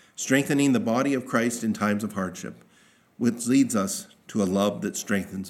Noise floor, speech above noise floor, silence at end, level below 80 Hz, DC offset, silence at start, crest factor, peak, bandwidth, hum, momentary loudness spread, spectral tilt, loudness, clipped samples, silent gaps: -59 dBFS; 34 dB; 0 s; -72 dBFS; under 0.1%; 0.2 s; 20 dB; -6 dBFS; 16.5 kHz; none; 10 LU; -5 dB/octave; -25 LUFS; under 0.1%; none